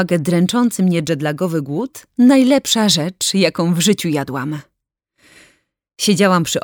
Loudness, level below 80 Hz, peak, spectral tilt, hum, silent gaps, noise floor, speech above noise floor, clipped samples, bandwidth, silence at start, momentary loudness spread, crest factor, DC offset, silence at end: -16 LUFS; -58 dBFS; -2 dBFS; -4.5 dB/octave; none; none; -68 dBFS; 53 dB; under 0.1%; 20 kHz; 0 s; 11 LU; 16 dB; under 0.1%; 0.05 s